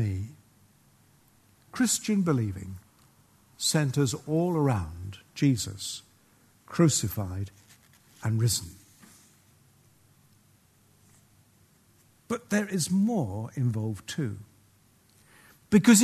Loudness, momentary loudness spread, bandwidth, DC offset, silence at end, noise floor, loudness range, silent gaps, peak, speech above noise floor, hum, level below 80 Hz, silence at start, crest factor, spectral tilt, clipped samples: -28 LUFS; 17 LU; 13.5 kHz; under 0.1%; 0 s; -62 dBFS; 6 LU; none; -8 dBFS; 36 dB; none; -58 dBFS; 0 s; 22 dB; -5 dB/octave; under 0.1%